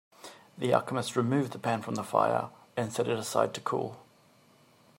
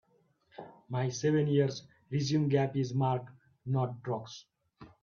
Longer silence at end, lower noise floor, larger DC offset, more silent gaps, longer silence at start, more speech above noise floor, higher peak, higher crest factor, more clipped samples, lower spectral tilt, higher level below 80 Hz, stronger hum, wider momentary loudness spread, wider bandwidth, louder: first, 0.95 s vs 0.15 s; second, -62 dBFS vs -70 dBFS; neither; neither; second, 0.25 s vs 0.6 s; second, 32 dB vs 40 dB; first, -8 dBFS vs -14 dBFS; about the same, 22 dB vs 18 dB; neither; about the same, -5.5 dB/octave vs -6.5 dB/octave; about the same, -74 dBFS vs -70 dBFS; neither; second, 10 LU vs 20 LU; first, 16 kHz vs 7.2 kHz; about the same, -30 LUFS vs -32 LUFS